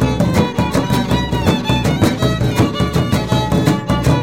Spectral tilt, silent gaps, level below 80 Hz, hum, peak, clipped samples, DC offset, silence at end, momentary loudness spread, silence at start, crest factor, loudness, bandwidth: -6 dB/octave; none; -28 dBFS; none; -2 dBFS; under 0.1%; 0.6%; 0 s; 2 LU; 0 s; 14 dB; -16 LUFS; 16.5 kHz